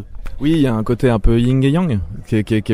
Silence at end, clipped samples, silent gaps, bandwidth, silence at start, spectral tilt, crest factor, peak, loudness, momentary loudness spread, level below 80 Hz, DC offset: 0 s; under 0.1%; none; 12.5 kHz; 0 s; -8 dB/octave; 14 dB; 0 dBFS; -17 LUFS; 7 LU; -24 dBFS; under 0.1%